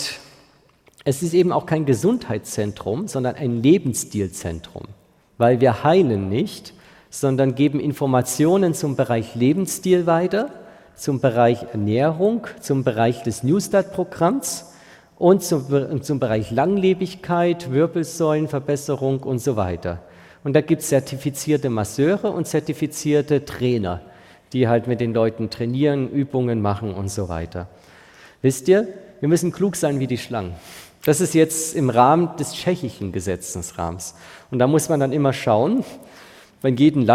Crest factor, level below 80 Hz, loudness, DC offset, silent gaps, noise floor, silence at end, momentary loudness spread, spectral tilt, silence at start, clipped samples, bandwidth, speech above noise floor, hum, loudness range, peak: 18 dB; -52 dBFS; -20 LUFS; under 0.1%; none; -55 dBFS; 0 s; 11 LU; -6 dB/octave; 0 s; under 0.1%; 16.5 kHz; 36 dB; none; 3 LU; -2 dBFS